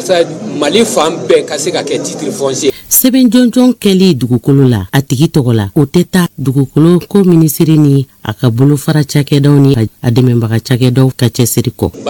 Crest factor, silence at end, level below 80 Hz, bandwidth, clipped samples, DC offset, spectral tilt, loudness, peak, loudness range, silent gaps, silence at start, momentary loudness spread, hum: 10 dB; 0 s; -42 dBFS; 19.5 kHz; 3%; under 0.1%; -6 dB/octave; -10 LUFS; 0 dBFS; 1 LU; none; 0 s; 7 LU; none